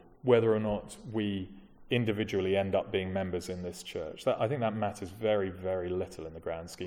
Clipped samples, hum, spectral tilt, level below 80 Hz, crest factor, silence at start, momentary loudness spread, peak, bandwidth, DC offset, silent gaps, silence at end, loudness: under 0.1%; none; -6.5 dB/octave; -58 dBFS; 20 dB; 0.25 s; 12 LU; -12 dBFS; 16.5 kHz; under 0.1%; none; 0 s; -32 LUFS